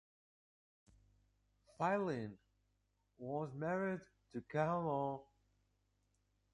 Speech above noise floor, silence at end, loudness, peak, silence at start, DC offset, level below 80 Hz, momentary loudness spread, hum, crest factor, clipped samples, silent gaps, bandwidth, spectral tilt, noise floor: 42 dB; 1.3 s; -41 LUFS; -22 dBFS; 1.8 s; under 0.1%; -76 dBFS; 14 LU; 50 Hz at -65 dBFS; 22 dB; under 0.1%; none; 10.5 kHz; -8 dB/octave; -82 dBFS